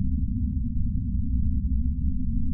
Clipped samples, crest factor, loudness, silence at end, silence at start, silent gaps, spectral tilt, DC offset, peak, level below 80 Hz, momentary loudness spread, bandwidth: under 0.1%; 10 dB; -28 LUFS; 0 s; 0 s; none; -19.5 dB/octave; under 0.1%; -14 dBFS; -28 dBFS; 2 LU; 0.3 kHz